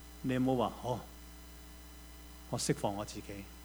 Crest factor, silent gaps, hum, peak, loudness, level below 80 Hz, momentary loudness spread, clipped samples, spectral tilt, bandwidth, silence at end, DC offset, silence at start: 20 dB; none; 60 Hz at -55 dBFS; -18 dBFS; -36 LUFS; -54 dBFS; 19 LU; under 0.1%; -5 dB/octave; over 20 kHz; 0 s; under 0.1%; 0 s